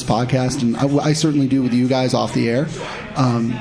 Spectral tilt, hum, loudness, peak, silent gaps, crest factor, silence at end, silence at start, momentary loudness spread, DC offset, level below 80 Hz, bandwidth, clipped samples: -6 dB/octave; none; -18 LUFS; -4 dBFS; none; 14 dB; 0 s; 0 s; 4 LU; under 0.1%; -46 dBFS; 10.5 kHz; under 0.1%